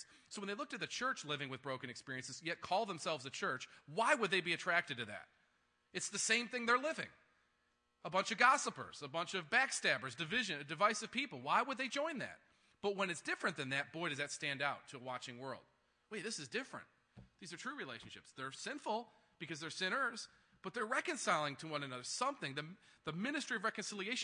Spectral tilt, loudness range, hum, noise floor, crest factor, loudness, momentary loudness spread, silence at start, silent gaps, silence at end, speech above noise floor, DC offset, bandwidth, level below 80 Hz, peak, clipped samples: -2.5 dB/octave; 9 LU; none; -80 dBFS; 26 dB; -39 LUFS; 14 LU; 0 s; none; 0 s; 40 dB; under 0.1%; 10.5 kHz; -84 dBFS; -16 dBFS; under 0.1%